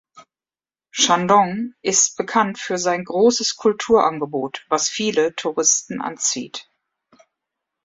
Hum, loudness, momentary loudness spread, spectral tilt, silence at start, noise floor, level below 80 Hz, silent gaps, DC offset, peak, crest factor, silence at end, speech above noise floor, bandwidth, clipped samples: none; -19 LUFS; 9 LU; -2 dB/octave; 0.15 s; under -90 dBFS; -62 dBFS; none; under 0.1%; -2 dBFS; 20 dB; 1.2 s; over 71 dB; 8 kHz; under 0.1%